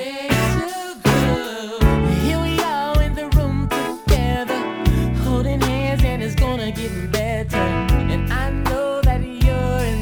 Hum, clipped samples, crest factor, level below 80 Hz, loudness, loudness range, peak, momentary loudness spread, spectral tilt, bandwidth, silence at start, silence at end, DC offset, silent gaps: none; under 0.1%; 16 dB; -24 dBFS; -20 LUFS; 1 LU; -2 dBFS; 4 LU; -6 dB/octave; over 20 kHz; 0 s; 0 s; under 0.1%; none